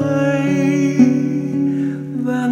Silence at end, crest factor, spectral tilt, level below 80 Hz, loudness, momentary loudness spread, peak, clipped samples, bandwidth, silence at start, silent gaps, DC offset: 0 s; 16 dB; -7.5 dB/octave; -60 dBFS; -17 LUFS; 8 LU; 0 dBFS; under 0.1%; 8.8 kHz; 0 s; none; under 0.1%